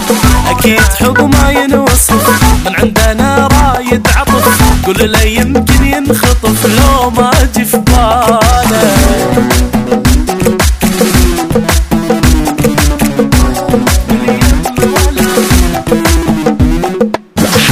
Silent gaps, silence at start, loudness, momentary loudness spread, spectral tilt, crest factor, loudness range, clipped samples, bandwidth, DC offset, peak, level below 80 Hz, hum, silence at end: none; 0 s; -8 LUFS; 4 LU; -4.5 dB/octave; 8 dB; 2 LU; 0.8%; 16.5 kHz; under 0.1%; 0 dBFS; -14 dBFS; none; 0 s